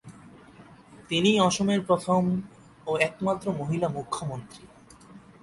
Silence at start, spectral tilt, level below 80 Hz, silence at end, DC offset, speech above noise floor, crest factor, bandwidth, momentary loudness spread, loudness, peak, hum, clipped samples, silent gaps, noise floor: 0.05 s; -5 dB/octave; -60 dBFS; 0.25 s; under 0.1%; 25 dB; 22 dB; 11.5 kHz; 15 LU; -26 LUFS; -6 dBFS; none; under 0.1%; none; -51 dBFS